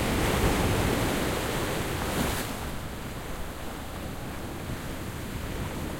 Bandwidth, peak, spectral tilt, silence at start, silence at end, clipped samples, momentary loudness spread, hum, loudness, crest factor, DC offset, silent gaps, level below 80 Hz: 16.5 kHz; -12 dBFS; -4.5 dB/octave; 0 s; 0 s; under 0.1%; 12 LU; none; -30 LUFS; 18 dB; under 0.1%; none; -38 dBFS